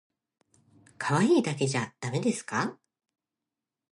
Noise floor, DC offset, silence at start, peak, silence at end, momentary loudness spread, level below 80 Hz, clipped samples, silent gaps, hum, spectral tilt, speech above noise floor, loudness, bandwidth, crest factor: -89 dBFS; under 0.1%; 1 s; -12 dBFS; 1.2 s; 10 LU; -74 dBFS; under 0.1%; none; none; -5.5 dB/octave; 62 dB; -28 LUFS; 11.5 kHz; 18 dB